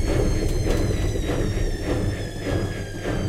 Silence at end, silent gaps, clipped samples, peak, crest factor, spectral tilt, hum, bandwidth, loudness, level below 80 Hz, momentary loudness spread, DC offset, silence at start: 0 s; none; under 0.1%; -8 dBFS; 14 dB; -6 dB/octave; none; 15 kHz; -26 LUFS; -26 dBFS; 5 LU; under 0.1%; 0 s